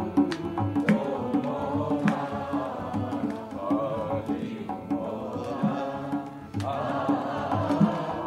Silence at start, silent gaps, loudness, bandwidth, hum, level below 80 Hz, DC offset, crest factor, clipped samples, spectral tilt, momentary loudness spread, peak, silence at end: 0 s; none; -29 LUFS; 11.5 kHz; none; -58 dBFS; under 0.1%; 20 dB; under 0.1%; -8 dB/octave; 8 LU; -8 dBFS; 0 s